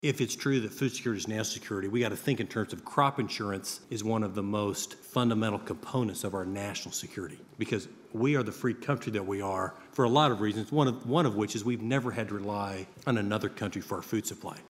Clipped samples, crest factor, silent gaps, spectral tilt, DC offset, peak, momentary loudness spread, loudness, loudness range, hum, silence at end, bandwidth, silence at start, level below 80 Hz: under 0.1%; 22 dB; none; -5 dB/octave; under 0.1%; -10 dBFS; 9 LU; -31 LUFS; 4 LU; none; 0.05 s; 16 kHz; 0.05 s; -72 dBFS